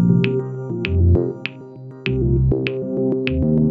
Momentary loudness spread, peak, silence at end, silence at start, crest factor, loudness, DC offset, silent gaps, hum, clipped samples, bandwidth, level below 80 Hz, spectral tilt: 12 LU; 0 dBFS; 0 s; 0 s; 18 dB; -20 LUFS; under 0.1%; none; none; under 0.1%; 5.4 kHz; -30 dBFS; -10 dB/octave